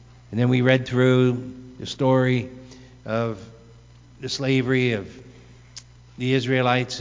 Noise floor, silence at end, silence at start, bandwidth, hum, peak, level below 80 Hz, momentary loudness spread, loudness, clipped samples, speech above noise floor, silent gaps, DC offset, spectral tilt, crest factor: -48 dBFS; 0 s; 0.3 s; 7.6 kHz; none; -4 dBFS; -54 dBFS; 22 LU; -22 LUFS; under 0.1%; 27 dB; none; under 0.1%; -6.5 dB/octave; 20 dB